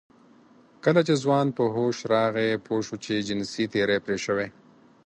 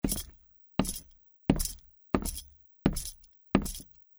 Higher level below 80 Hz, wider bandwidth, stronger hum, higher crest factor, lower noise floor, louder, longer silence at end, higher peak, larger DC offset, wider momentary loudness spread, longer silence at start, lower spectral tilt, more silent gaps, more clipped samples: second, -64 dBFS vs -42 dBFS; second, 10 kHz vs over 20 kHz; neither; second, 18 dB vs 28 dB; about the same, -55 dBFS vs -58 dBFS; first, -25 LUFS vs -33 LUFS; first, 0.55 s vs 0.35 s; about the same, -8 dBFS vs -6 dBFS; neither; second, 7 LU vs 13 LU; first, 0.85 s vs 0.05 s; about the same, -5.5 dB/octave vs -5 dB/octave; neither; neither